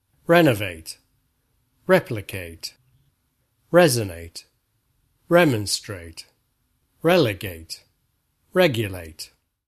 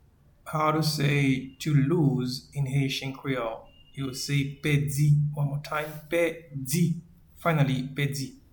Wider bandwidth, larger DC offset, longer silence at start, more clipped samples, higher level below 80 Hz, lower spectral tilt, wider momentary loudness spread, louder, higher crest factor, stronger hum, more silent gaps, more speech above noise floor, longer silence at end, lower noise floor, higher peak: second, 13.5 kHz vs 19 kHz; neither; second, 0.3 s vs 0.45 s; neither; about the same, -54 dBFS vs -56 dBFS; about the same, -5 dB/octave vs -6 dB/octave; first, 22 LU vs 11 LU; first, -21 LUFS vs -27 LUFS; first, 22 dB vs 16 dB; neither; neither; first, 49 dB vs 23 dB; first, 0.45 s vs 0.2 s; first, -70 dBFS vs -49 dBFS; first, -2 dBFS vs -10 dBFS